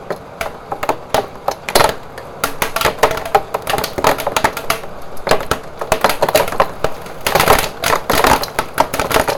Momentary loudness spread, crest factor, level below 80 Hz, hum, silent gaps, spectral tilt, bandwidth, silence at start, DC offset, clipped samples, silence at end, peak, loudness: 11 LU; 16 dB; -34 dBFS; none; none; -3 dB/octave; 19.5 kHz; 0 s; under 0.1%; under 0.1%; 0 s; 0 dBFS; -16 LUFS